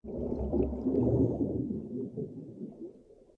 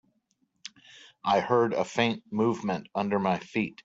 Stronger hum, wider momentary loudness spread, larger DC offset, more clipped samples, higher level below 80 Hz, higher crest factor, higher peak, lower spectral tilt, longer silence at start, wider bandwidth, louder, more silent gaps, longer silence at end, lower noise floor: neither; second, 16 LU vs 20 LU; neither; neither; first, -44 dBFS vs -68 dBFS; about the same, 16 dB vs 20 dB; second, -16 dBFS vs -10 dBFS; first, -12.5 dB/octave vs -6 dB/octave; second, 0.05 s vs 0.95 s; second, 2.8 kHz vs 8 kHz; second, -32 LUFS vs -28 LUFS; neither; about the same, 0.25 s vs 0.15 s; second, -54 dBFS vs -73 dBFS